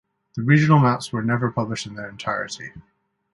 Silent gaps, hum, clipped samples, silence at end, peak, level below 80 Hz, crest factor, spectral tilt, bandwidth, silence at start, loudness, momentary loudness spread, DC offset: none; none; under 0.1%; 0.55 s; -2 dBFS; -58 dBFS; 20 dB; -6.5 dB/octave; 11.5 kHz; 0.35 s; -21 LUFS; 18 LU; under 0.1%